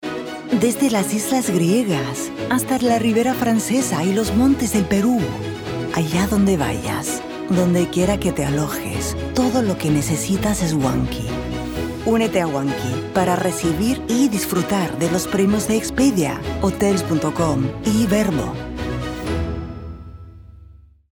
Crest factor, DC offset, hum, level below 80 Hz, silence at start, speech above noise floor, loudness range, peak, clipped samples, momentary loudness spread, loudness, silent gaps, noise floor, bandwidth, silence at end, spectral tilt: 14 dB; under 0.1%; none; -38 dBFS; 0 s; 27 dB; 2 LU; -4 dBFS; under 0.1%; 8 LU; -20 LUFS; none; -45 dBFS; 19.5 kHz; 0.4 s; -5.5 dB/octave